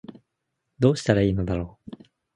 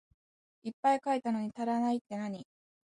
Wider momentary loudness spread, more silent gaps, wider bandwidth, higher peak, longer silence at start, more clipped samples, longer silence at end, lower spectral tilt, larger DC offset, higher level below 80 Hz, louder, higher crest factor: first, 21 LU vs 15 LU; second, none vs 0.73-0.83 s, 2.01-2.05 s; about the same, 11 kHz vs 10.5 kHz; first, -2 dBFS vs -16 dBFS; second, 0.1 s vs 0.65 s; neither; first, 0.7 s vs 0.45 s; about the same, -7 dB/octave vs -6 dB/octave; neither; first, -44 dBFS vs -80 dBFS; first, -23 LUFS vs -33 LUFS; first, 24 dB vs 18 dB